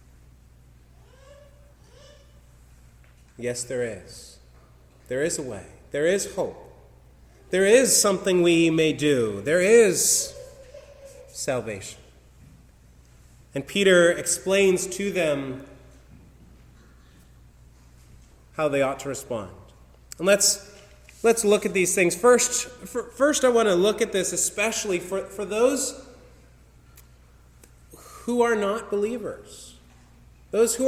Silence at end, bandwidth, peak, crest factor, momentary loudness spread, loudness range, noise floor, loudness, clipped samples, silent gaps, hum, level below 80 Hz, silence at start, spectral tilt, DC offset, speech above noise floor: 0 s; 16.5 kHz; -4 dBFS; 20 dB; 18 LU; 14 LU; -53 dBFS; -22 LUFS; under 0.1%; none; none; -54 dBFS; 3.4 s; -3 dB/octave; under 0.1%; 30 dB